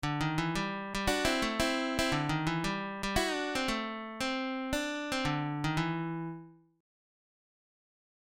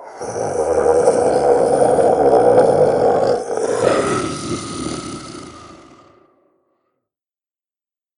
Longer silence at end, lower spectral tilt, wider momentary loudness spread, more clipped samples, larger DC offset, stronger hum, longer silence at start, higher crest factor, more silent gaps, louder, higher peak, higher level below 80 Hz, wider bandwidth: second, 1.75 s vs 2.4 s; about the same, -4.5 dB/octave vs -5 dB/octave; second, 6 LU vs 15 LU; neither; neither; neither; about the same, 0 s vs 0 s; about the same, 20 dB vs 18 dB; neither; second, -33 LUFS vs -16 LUFS; second, -14 dBFS vs 0 dBFS; about the same, -50 dBFS vs -48 dBFS; first, 16.5 kHz vs 11 kHz